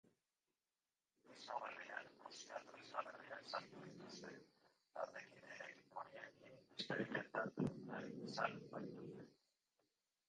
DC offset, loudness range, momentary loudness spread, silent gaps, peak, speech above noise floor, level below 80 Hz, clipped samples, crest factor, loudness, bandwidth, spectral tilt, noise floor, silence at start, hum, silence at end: under 0.1%; 6 LU; 14 LU; none; -26 dBFS; over 42 dB; -86 dBFS; under 0.1%; 26 dB; -50 LUFS; 10 kHz; -5 dB/octave; under -90 dBFS; 0.05 s; none; 0.95 s